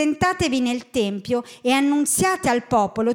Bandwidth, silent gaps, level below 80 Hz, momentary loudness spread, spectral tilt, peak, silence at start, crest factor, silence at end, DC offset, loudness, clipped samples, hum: 18 kHz; none; -50 dBFS; 6 LU; -4 dB/octave; -6 dBFS; 0 s; 14 dB; 0 s; under 0.1%; -21 LUFS; under 0.1%; none